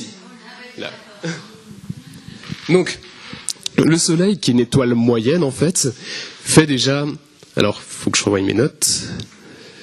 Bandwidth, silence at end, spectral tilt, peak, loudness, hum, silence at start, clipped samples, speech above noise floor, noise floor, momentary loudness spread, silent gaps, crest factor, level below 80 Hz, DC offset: 13.5 kHz; 0 s; -4.5 dB/octave; 0 dBFS; -17 LUFS; none; 0 s; under 0.1%; 24 dB; -41 dBFS; 20 LU; none; 18 dB; -52 dBFS; under 0.1%